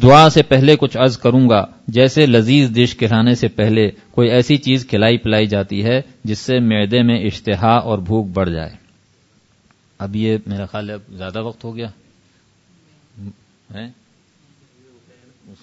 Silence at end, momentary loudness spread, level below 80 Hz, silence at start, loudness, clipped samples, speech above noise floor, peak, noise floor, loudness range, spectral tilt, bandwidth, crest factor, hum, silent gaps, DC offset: 1.75 s; 17 LU; -44 dBFS; 0 s; -15 LUFS; under 0.1%; 42 dB; 0 dBFS; -56 dBFS; 17 LU; -6.5 dB/octave; 8 kHz; 16 dB; none; none; under 0.1%